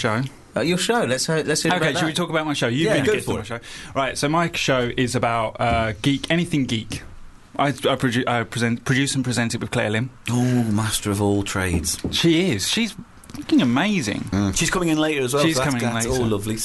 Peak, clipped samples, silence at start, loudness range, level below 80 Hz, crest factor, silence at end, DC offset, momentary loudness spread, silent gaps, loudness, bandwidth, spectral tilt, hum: -8 dBFS; under 0.1%; 0 s; 2 LU; -42 dBFS; 12 dB; 0 s; under 0.1%; 6 LU; none; -21 LUFS; 12.5 kHz; -4.5 dB/octave; none